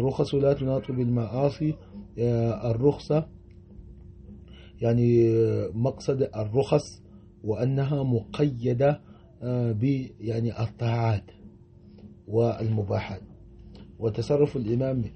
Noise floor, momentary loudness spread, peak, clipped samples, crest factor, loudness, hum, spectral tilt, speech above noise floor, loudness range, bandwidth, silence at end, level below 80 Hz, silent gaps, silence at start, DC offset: -50 dBFS; 9 LU; -8 dBFS; under 0.1%; 18 dB; -26 LUFS; none; -8.5 dB/octave; 25 dB; 4 LU; 8.4 kHz; 0 s; -50 dBFS; none; 0 s; under 0.1%